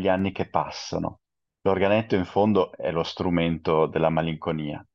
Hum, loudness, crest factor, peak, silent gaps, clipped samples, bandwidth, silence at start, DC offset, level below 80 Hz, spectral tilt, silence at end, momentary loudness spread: none; -25 LUFS; 18 dB; -6 dBFS; none; under 0.1%; 7.2 kHz; 0 s; under 0.1%; -56 dBFS; -7 dB/octave; 0.15 s; 8 LU